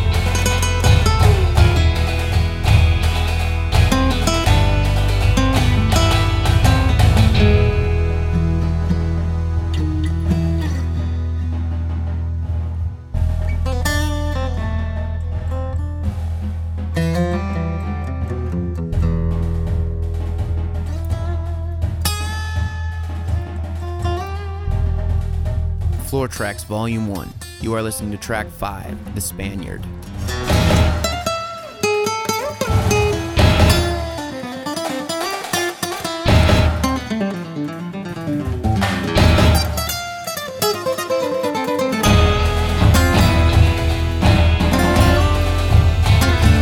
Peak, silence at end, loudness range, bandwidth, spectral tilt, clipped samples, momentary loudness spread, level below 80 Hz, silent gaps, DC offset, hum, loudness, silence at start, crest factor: 0 dBFS; 0 s; 8 LU; 17 kHz; -5.5 dB/octave; under 0.1%; 11 LU; -22 dBFS; none; under 0.1%; none; -18 LUFS; 0 s; 16 dB